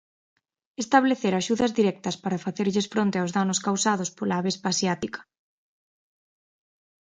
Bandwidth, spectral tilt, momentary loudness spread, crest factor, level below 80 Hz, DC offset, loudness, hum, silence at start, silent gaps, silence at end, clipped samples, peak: 9.6 kHz; -4.5 dB/octave; 9 LU; 22 dB; -66 dBFS; under 0.1%; -25 LUFS; none; 0.8 s; none; 1.8 s; under 0.1%; -4 dBFS